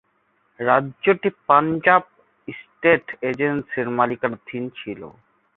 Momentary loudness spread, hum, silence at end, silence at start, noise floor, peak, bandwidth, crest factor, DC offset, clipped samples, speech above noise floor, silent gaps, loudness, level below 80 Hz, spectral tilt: 18 LU; none; 0.45 s; 0.6 s; -66 dBFS; 0 dBFS; 4.2 kHz; 22 dB; under 0.1%; under 0.1%; 45 dB; none; -20 LUFS; -62 dBFS; -8.5 dB/octave